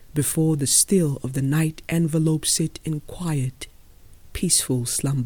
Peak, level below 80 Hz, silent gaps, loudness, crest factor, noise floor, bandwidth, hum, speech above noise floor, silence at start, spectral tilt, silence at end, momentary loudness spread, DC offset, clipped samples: -4 dBFS; -44 dBFS; none; -22 LUFS; 18 dB; -47 dBFS; 19 kHz; none; 25 dB; 0 s; -4.5 dB/octave; 0 s; 13 LU; under 0.1%; under 0.1%